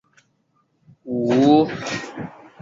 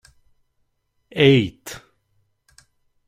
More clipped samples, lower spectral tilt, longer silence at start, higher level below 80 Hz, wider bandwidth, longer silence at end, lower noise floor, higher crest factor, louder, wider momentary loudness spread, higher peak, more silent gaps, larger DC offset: neither; about the same, -6 dB/octave vs -6 dB/octave; about the same, 1.05 s vs 1.15 s; about the same, -60 dBFS vs -56 dBFS; second, 7.6 kHz vs 15.5 kHz; second, 0.3 s vs 1.3 s; second, -66 dBFS vs -70 dBFS; about the same, 18 dB vs 22 dB; about the same, -19 LUFS vs -17 LUFS; second, 19 LU vs 22 LU; about the same, -4 dBFS vs -2 dBFS; neither; neither